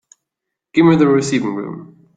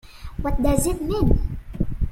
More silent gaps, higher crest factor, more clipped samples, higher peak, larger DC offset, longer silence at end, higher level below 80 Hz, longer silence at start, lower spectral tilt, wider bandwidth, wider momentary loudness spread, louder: neither; about the same, 16 dB vs 18 dB; neither; about the same, -2 dBFS vs -4 dBFS; neither; first, 0.35 s vs 0 s; second, -56 dBFS vs -26 dBFS; first, 0.75 s vs 0.1 s; about the same, -6.5 dB/octave vs -6.5 dB/octave; second, 9.2 kHz vs 16.5 kHz; first, 17 LU vs 10 LU; first, -15 LUFS vs -24 LUFS